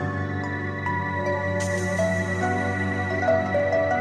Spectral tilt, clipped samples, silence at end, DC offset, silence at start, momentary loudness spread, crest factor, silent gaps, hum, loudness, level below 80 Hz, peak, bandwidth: -6 dB/octave; under 0.1%; 0 s; under 0.1%; 0 s; 6 LU; 14 dB; none; none; -25 LUFS; -56 dBFS; -10 dBFS; 12 kHz